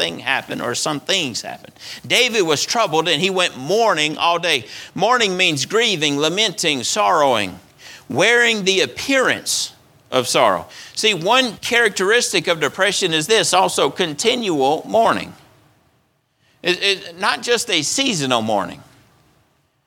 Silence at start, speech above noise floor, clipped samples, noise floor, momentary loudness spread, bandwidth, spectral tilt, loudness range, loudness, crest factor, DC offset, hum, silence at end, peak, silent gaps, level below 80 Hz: 0 s; 45 dB; under 0.1%; -63 dBFS; 8 LU; 19 kHz; -2 dB/octave; 4 LU; -17 LUFS; 18 dB; under 0.1%; none; 1.05 s; 0 dBFS; none; -62 dBFS